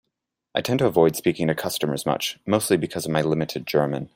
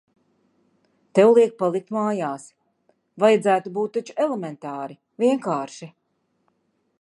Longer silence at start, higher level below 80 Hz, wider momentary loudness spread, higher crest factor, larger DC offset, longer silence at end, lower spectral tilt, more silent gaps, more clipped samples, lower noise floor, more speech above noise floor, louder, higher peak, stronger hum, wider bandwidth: second, 0.55 s vs 1.15 s; first, -58 dBFS vs -78 dBFS; second, 6 LU vs 17 LU; about the same, 20 dB vs 20 dB; neither; second, 0.1 s vs 1.15 s; about the same, -5 dB/octave vs -6 dB/octave; neither; neither; first, -81 dBFS vs -70 dBFS; first, 58 dB vs 49 dB; about the same, -23 LUFS vs -21 LUFS; about the same, -4 dBFS vs -4 dBFS; neither; first, 16.5 kHz vs 11 kHz